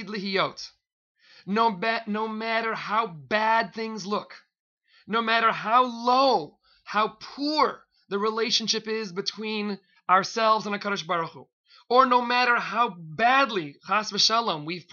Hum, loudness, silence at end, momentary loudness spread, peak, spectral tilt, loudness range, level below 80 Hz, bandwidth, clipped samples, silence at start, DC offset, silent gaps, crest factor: none; -25 LUFS; 0.1 s; 11 LU; -6 dBFS; -3 dB/octave; 4 LU; -72 dBFS; 7.2 kHz; under 0.1%; 0 s; under 0.1%; 0.92-1.15 s, 4.60-4.77 s, 11.53-11.64 s; 20 dB